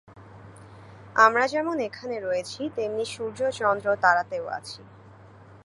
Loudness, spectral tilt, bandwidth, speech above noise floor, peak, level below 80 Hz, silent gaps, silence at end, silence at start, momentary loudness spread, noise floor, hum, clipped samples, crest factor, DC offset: -25 LUFS; -4 dB/octave; 11.5 kHz; 24 dB; -4 dBFS; -64 dBFS; none; 0.05 s; 0.1 s; 14 LU; -49 dBFS; none; under 0.1%; 22 dB; under 0.1%